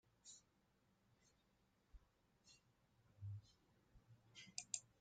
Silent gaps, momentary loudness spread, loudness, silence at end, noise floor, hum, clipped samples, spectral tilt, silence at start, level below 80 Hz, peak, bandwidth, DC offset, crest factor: none; 15 LU; -55 LUFS; 0.1 s; -81 dBFS; none; under 0.1%; -1.5 dB/octave; 0.05 s; -78 dBFS; -26 dBFS; 9 kHz; under 0.1%; 36 dB